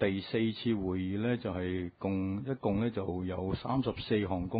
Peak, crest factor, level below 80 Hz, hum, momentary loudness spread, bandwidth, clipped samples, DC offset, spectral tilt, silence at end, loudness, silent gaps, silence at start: -16 dBFS; 18 dB; -50 dBFS; none; 4 LU; 4.9 kHz; under 0.1%; under 0.1%; -6 dB/octave; 0 s; -34 LUFS; none; 0 s